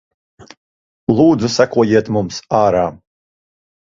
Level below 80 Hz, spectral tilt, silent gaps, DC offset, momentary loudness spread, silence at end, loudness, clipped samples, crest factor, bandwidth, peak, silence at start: -48 dBFS; -6 dB/octave; 0.57-1.07 s; under 0.1%; 8 LU; 1.05 s; -15 LUFS; under 0.1%; 16 dB; 7.6 kHz; 0 dBFS; 0.4 s